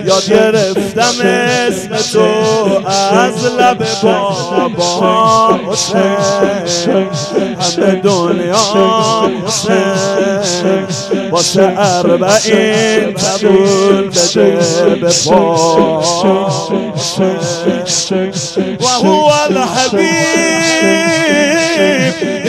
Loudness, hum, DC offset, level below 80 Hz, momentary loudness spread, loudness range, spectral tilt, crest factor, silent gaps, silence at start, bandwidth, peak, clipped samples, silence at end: -11 LUFS; none; under 0.1%; -48 dBFS; 5 LU; 2 LU; -3.5 dB/octave; 10 dB; none; 0 s; 15 kHz; 0 dBFS; 0.4%; 0 s